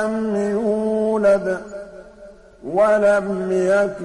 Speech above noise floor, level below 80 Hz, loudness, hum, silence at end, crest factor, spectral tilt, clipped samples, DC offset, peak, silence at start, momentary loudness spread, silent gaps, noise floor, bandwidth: 25 dB; -52 dBFS; -19 LUFS; none; 0 s; 12 dB; -6.5 dB/octave; under 0.1%; under 0.1%; -8 dBFS; 0 s; 17 LU; none; -43 dBFS; 11 kHz